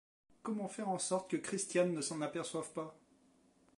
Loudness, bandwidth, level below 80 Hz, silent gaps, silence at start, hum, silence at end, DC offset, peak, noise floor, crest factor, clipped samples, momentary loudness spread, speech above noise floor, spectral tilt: -38 LUFS; 11.5 kHz; -84 dBFS; none; 0.45 s; none; 0.8 s; under 0.1%; -20 dBFS; -70 dBFS; 20 dB; under 0.1%; 11 LU; 32 dB; -4 dB/octave